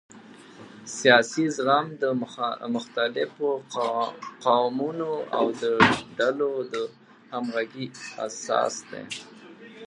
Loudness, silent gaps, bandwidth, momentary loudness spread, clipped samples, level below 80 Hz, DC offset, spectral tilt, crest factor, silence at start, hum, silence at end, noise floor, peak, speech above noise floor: -25 LUFS; none; 11.5 kHz; 16 LU; under 0.1%; -66 dBFS; under 0.1%; -4 dB/octave; 24 dB; 0.15 s; none; 0.05 s; -47 dBFS; -2 dBFS; 22 dB